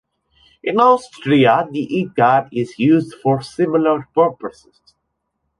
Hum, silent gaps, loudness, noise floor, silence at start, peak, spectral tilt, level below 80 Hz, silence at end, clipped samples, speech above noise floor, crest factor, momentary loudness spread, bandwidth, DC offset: none; none; -16 LUFS; -73 dBFS; 0.65 s; -2 dBFS; -7 dB/octave; -58 dBFS; 1.1 s; under 0.1%; 57 dB; 16 dB; 8 LU; 11.5 kHz; under 0.1%